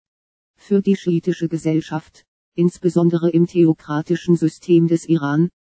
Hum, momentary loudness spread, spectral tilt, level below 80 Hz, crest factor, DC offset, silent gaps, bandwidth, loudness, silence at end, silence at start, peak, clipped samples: none; 7 LU; -8 dB/octave; -62 dBFS; 14 dB; under 0.1%; 2.28-2.52 s; 8 kHz; -18 LUFS; 0.15 s; 0.7 s; -4 dBFS; under 0.1%